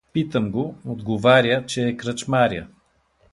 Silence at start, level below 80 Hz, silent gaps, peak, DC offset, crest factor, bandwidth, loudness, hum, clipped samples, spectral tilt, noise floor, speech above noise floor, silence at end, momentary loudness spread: 0.15 s; -52 dBFS; none; -2 dBFS; under 0.1%; 18 dB; 11.5 kHz; -21 LUFS; none; under 0.1%; -5.5 dB/octave; -62 dBFS; 41 dB; 0.65 s; 13 LU